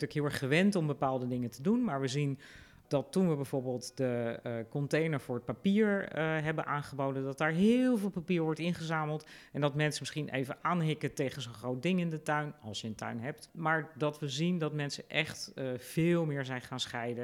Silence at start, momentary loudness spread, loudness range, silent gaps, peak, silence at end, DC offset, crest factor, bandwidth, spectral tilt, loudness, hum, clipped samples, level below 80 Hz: 0 s; 10 LU; 4 LU; none; -14 dBFS; 0 s; under 0.1%; 20 dB; 16 kHz; -6 dB/octave; -33 LUFS; none; under 0.1%; -68 dBFS